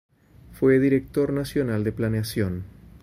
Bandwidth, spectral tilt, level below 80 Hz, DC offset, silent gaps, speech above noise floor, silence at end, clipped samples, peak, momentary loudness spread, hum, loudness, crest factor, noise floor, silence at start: 16 kHz; -7.5 dB/octave; -48 dBFS; under 0.1%; none; 26 dB; 0.05 s; under 0.1%; -8 dBFS; 9 LU; none; -24 LUFS; 16 dB; -49 dBFS; 0.5 s